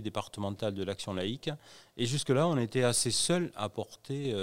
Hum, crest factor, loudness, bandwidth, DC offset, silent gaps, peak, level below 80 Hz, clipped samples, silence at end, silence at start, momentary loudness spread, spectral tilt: none; 20 dB; -32 LUFS; 16 kHz; under 0.1%; none; -12 dBFS; -64 dBFS; under 0.1%; 0 s; 0 s; 12 LU; -4 dB/octave